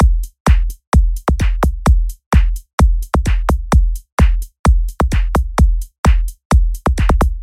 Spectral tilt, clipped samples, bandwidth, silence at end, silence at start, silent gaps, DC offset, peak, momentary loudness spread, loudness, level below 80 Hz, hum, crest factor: -6.5 dB/octave; under 0.1%; 14 kHz; 0 s; 0 s; 0.40-0.45 s, 0.87-0.92 s, 2.26-2.31 s, 2.73-2.78 s, 4.12-4.17 s, 4.59-4.64 s, 5.98-6.04 s, 6.45-6.50 s; under 0.1%; -2 dBFS; 3 LU; -17 LUFS; -14 dBFS; none; 12 dB